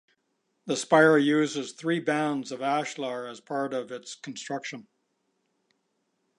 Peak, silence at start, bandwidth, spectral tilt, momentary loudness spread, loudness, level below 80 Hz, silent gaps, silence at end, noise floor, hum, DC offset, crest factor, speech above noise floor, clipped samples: -6 dBFS; 0.65 s; 11.5 kHz; -4.5 dB/octave; 19 LU; -26 LUFS; -84 dBFS; none; 1.55 s; -76 dBFS; none; under 0.1%; 22 dB; 49 dB; under 0.1%